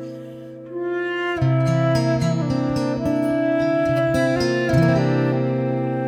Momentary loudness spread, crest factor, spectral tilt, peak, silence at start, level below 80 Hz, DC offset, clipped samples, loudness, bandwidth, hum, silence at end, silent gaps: 10 LU; 14 dB; -7.5 dB/octave; -6 dBFS; 0 s; -46 dBFS; under 0.1%; under 0.1%; -20 LUFS; 12.5 kHz; none; 0 s; none